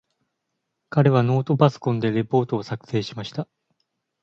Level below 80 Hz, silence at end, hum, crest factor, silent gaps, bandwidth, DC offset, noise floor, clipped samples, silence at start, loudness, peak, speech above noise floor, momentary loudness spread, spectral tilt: -62 dBFS; 0.8 s; none; 20 dB; none; 7.2 kHz; under 0.1%; -78 dBFS; under 0.1%; 0.9 s; -22 LUFS; -2 dBFS; 57 dB; 13 LU; -8 dB/octave